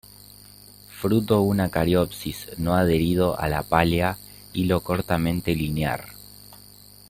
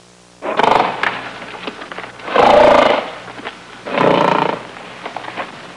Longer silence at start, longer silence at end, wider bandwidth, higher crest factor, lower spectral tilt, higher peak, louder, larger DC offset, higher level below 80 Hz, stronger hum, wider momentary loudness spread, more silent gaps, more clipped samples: first, 0.9 s vs 0.4 s; first, 0.55 s vs 0 s; first, 16.5 kHz vs 11 kHz; first, 20 dB vs 14 dB; first, -6.5 dB/octave vs -5 dB/octave; about the same, -2 dBFS vs -2 dBFS; second, -23 LUFS vs -13 LUFS; neither; about the same, -44 dBFS vs -48 dBFS; about the same, 50 Hz at -45 dBFS vs 60 Hz at -50 dBFS; second, 14 LU vs 20 LU; neither; neither